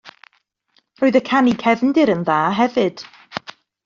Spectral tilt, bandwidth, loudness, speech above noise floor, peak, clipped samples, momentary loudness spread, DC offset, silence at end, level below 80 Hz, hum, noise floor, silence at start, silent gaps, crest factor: -4 dB/octave; 7.4 kHz; -17 LUFS; 47 dB; -2 dBFS; under 0.1%; 16 LU; under 0.1%; 0.5 s; -62 dBFS; none; -63 dBFS; 0.05 s; none; 16 dB